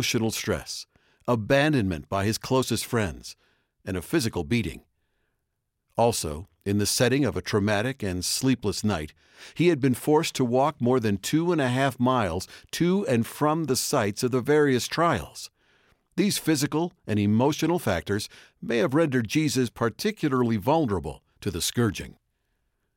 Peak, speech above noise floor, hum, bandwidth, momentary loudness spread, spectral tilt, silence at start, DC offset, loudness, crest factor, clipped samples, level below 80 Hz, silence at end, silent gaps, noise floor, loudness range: -10 dBFS; 54 dB; none; 17 kHz; 12 LU; -5 dB/octave; 0 s; under 0.1%; -25 LUFS; 16 dB; under 0.1%; -52 dBFS; 0.85 s; none; -79 dBFS; 4 LU